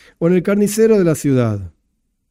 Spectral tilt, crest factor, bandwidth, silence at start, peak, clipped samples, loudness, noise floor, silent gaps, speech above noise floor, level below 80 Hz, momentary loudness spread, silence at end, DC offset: -7 dB/octave; 14 dB; 16 kHz; 0.2 s; -2 dBFS; under 0.1%; -15 LUFS; -67 dBFS; none; 52 dB; -50 dBFS; 6 LU; 0.6 s; under 0.1%